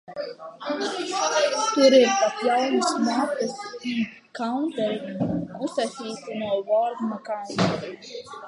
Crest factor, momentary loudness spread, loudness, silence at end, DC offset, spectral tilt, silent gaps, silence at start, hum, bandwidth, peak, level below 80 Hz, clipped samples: 20 dB; 14 LU; -24 LUFS; 0 s; under 0.1%; -4 dB/octave; none; 0.1 s; none; 11.5 kHz; -4 dBFS; -62 dBFS; under 0.1%